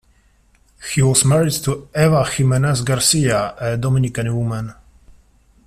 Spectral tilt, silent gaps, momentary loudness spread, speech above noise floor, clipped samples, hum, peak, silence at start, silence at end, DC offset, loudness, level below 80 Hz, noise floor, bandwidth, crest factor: -4.5 dB/octave; none; 9 LU; 39 dB; under 0.1%; none; 0 dBFS; 0.8 s; 0.95 s; under 0.1%; -17 LUFS; -44 dBFS; -55 dBFS; 15 kHz; 18 dB